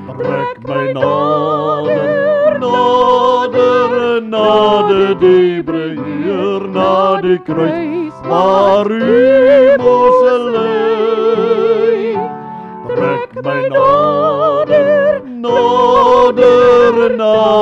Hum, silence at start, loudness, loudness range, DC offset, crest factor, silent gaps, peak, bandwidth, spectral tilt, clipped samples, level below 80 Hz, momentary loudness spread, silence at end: none; 0 s; -11 LUFS; 4 LU; under 0.1%; 10 dB; none; 0 dBFS; 7.6 kHz; -6.5 dB/octave; under 0.1%; -48 dBFS; 10 LU; 0 s